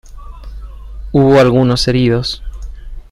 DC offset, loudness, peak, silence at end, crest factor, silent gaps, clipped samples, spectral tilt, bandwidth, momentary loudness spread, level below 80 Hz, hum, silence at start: under 0.1%; -12 LUFS; 0 dBFS; 0.1 s; 14 dB; none; under 0.1%; -6.5 dB/octave; 12.5 kHz; 25 LU; -28 dBFS; none; 0.05 s